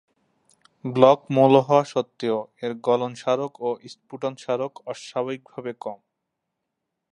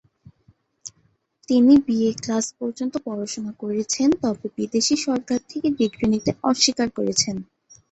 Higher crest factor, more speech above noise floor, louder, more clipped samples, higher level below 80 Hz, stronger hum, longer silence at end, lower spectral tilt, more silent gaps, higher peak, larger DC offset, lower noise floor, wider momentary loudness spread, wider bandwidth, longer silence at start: about the same, 22 dB vs 18 dB; first, 58 dB vs 44 dB; about the same, -23 LUFS vs -21 LUFS; neither; second, -74 dBFS vs -56 dBFS; neither; first, 1.15 s vs 0.5 s; first, -6.5 dB/octave vs -3.5 dB/octave; neither; first, 0 dBFS vs -4 dBFS; neither; first, -81 dBFS vs -65 dBFS; first, 18 LU vs 12 LU; first, 10.5 kHz vs 8.2 kHz; about the same, 0.85 s vs 0.85 s